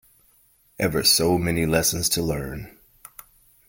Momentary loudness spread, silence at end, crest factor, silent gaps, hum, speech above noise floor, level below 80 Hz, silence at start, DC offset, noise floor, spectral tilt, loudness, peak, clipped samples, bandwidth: 13 LU; 1 s; 20 dB; none; none; 38 dB; -44 dBFS; 0.8 s; under 0.1%; -60 dBFS; -3.5 dB/octave; -21 LUFS; -6 dBFS; under 0.1%; 17 kHz